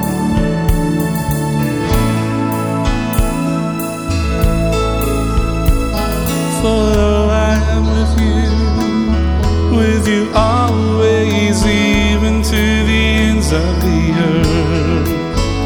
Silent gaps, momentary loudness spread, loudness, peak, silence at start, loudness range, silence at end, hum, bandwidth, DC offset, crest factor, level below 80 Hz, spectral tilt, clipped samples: none; 4 LU; -14 LUFS; 0 dBFS; 0 s; 3 LU; 0 s; none; over 20 kHz; 0.3%; 12 dB; -20 dBFS; -6 dB/octave; under 0.1%